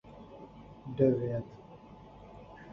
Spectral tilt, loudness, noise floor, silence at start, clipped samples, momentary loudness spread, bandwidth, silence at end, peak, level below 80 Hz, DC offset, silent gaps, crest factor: -10.5 dB/octave; -31 LUFS; -52 dBFS; 0.05 s; under 0.1%; 24 LU; 6.2 kHz; 0 s; -14 dBFS; -60 dBFS; under 0.1%; none; 22 dB